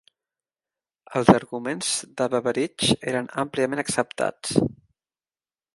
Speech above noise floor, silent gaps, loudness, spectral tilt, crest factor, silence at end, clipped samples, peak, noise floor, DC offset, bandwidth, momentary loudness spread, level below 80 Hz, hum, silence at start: over 67 dB; none; -24 LUFS; -4 dB/octave; 24 dB; 1.05 s; under 0.1%; 0 dBFS; under -90 dBFS; under 0.1%; 12 kHz; 9 LU; -56 dBFS; none; 1.1 s